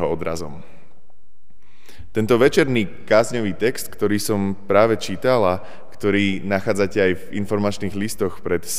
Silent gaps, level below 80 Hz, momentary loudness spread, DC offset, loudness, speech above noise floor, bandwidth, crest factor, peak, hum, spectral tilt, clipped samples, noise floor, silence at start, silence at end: none; -48 dBFS; 9 LU; 4%; -20 LUFS; 42 dB; 15.5 kHz; 20 dB; -2 dBFS; none; -5 dB/octave; under 0.1%; -62 dBFS; 0 s; 0 s